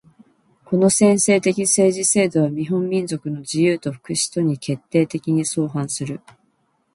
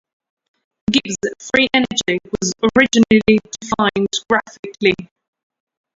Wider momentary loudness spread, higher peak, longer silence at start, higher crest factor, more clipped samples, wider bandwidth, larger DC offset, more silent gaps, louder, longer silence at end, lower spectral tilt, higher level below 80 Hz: about the same, 11 LU vs 11 LU; second, -4 dBFS vs 0 dBFS; second, 0.7 s vs 0.9 s; about the same, 16 dB vs 18 dB; neither; first, 11.5 kHz vs 7.8 kHz; neither; second, none vs 4.59-4.63 s; about the same, -19 LUFS vs -17 LUFS; second, 0.75 s vs 0.9 s; about the same, -4.5 dB/octave vs -3.5 dB/octave; second, -62 dBFS vs -48 dBFS